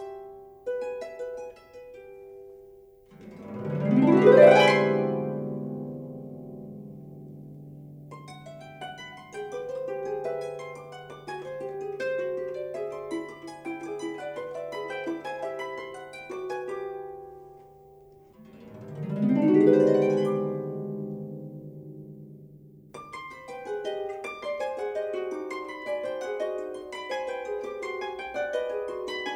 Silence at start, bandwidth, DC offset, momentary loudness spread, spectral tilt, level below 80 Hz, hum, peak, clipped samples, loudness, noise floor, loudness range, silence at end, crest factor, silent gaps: 0 s; 12 kHz; under 0.1%; 24 LU; -6.5 dB/octave; -68 dBFS; none; -4 dBFS; under 0.1%; -27 LUFS; -53 dBFS; 18 LU; 0 s; 24 dB; none